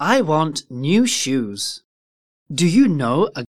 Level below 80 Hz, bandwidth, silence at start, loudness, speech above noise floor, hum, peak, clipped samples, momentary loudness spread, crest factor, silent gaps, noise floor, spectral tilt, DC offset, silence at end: -62 dBFS; 15.5 kHz; 0 s; -19 LUFS; over 72 dB; none; -2 dBFS; under 0.1%; 11 LU; 16 dB; 1.84-2.46 s; under -90 dBFS; -4.5 dB/octave; 0.5%; 0.1 s